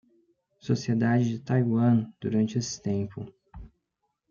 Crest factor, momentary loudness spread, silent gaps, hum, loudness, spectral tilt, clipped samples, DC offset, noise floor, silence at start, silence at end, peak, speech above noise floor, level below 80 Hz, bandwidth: 16 dB; 14 LU; none; none; -27 LUFS; -7 dB/octave; under 0.1%; under 0.1%; -79 dBFS; 0.65 s; 0.65 s; -12 dBFS; 54 dB; -58 dBFS; 7.2 kHz